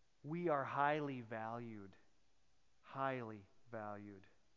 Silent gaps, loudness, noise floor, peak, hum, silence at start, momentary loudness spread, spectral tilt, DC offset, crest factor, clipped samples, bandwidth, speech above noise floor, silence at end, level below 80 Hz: none; -43 LUFS; -80 dBFS; -22 dBFS; none; 0.25 s; 20 LU; -5 dB/octave; under 0.1%; 22 dB; under 0.1%; 7.2 kHz; 37 dB; 0.35 s; -82 dBFS